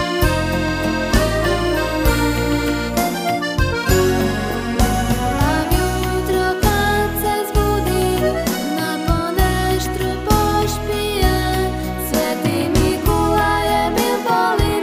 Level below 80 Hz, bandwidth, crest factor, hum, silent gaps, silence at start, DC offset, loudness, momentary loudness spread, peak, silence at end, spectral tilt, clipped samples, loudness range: -24 dBFS; 16 kHz; 14 dB; none; none; 0 s; under 0.1%; -18 LUFS; 4 LU; -2 dBFS; 0 s; -5 dB/octave; under 0.1%; 1 LU